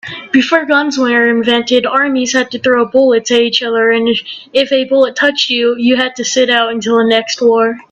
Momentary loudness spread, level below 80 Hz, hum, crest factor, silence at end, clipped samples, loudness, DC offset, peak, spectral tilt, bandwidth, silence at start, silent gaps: 3 LU; -58 dBFS; none; 12 dB; 0.1 s; under 0.1%; -11 LUFS; under 0.1%; 0 dBFS; -2.5 dB/octave; 8.2 kHz; 0.05 s; none